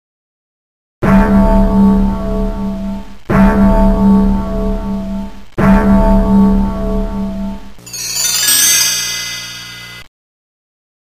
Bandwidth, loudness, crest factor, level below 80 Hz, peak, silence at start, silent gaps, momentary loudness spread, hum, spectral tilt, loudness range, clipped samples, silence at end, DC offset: 16 kHz; -12 LUFS; 12 dB; -20 dBFS; 0 dBFS; 1 s; none; 16 LU; none; -4.5 dB/octave; 2 LU; under 0.1%; 1.05 s; under 0.1%